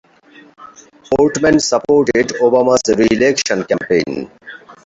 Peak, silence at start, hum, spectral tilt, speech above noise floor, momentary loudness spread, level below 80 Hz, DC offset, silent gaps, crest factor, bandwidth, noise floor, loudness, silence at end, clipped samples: 0 dBFS; 0.6 s; none; -4 dB/octave; 31 dB; 9 LU; -46 dBFS; under 0.1%; none; 14 dB; 8 kHz; -44 dBFS; -14 LUFS; 0.15 s; under 0.1%